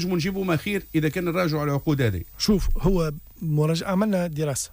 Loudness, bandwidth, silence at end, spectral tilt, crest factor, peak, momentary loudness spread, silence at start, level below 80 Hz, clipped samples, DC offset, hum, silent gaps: -24 LUFS; 15.5 kHz; 0.05 s; -6 dB/octave; 12 dB; -12 dBFS; 3 LU; 0 s; -34 dBFS; under 0.1%; under 0.1%; none; none